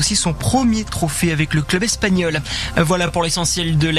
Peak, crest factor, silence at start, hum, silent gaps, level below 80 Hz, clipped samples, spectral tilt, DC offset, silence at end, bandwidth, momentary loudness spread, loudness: -2 dBFS; 16 dB; 0 s; none; none; -32 dBFS; under 0.1%; -4 dB/octave; under 0.1%; 0 s; 14 kHz; 3 LU; -18 LUFS